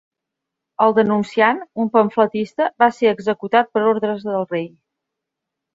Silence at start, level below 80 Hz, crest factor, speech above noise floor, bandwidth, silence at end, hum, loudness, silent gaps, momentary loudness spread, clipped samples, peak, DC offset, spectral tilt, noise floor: 0.8 s; -66 dBFS; 18 dB; 65 dB; 7.8 kHz; 1.05 s; none; -18 LUFS; none; 7 LU; under 0.1%; -2 dBFS; under 0.1%; -6.5 dB/octave; -82 dBFS